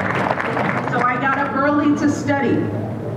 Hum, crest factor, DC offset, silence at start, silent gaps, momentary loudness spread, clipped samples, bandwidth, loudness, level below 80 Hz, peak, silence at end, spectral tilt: none; 14 dB; under 0.1%; 0 s; none; 4 LU; under 0.1%; 10.5 kHz; -19 LUFS; -52 dBFS; -4 dBFS; 0 s; -6.5 dB/octave